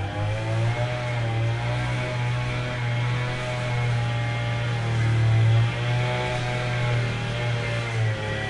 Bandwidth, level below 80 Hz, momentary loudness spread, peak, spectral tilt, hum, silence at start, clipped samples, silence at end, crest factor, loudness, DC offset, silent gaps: 10.5 kHz; -42 dBFS; 6 LU; -12 dBFS; -6 dB/octave; none; 0 s; under 0.1%; 0 s; 12 dB; -25 LUFS; under 0.1%; none